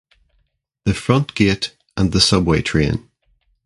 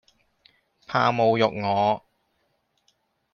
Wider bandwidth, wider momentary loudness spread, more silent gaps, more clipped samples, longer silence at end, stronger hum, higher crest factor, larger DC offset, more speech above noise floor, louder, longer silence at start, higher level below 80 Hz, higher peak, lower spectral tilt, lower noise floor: first, 11.5 kHz vs 7 kHz; first, 10 LU vs 7 LU; neither; neither; second, 0.65 s vs 1.35 s; neither; about the same, 20 dB vs 20 dB; neither; about the same, 49 dB vs 50 dB; first, -18 LUFS vs -23 LUFS; about the same, 0.85 s vs 0.9 s; first, -34 dBFS vs -66 dBFS; first, 0 dBFS vs -6 dBFS; second, -5 dB/octave vs -6.5 dB/octave; second, -66 dBFS vs -71 dBFS